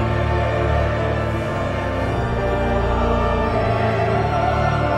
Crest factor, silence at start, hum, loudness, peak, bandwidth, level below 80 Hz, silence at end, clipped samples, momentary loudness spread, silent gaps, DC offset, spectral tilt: 12 dB; 0 s; none; -20 LUFS; -6 dBFS; 9.8 kHz; -26 dBFS; 0 s; under 0.1%; 3 LU; none; under 0.1%; -7.5 dB/octave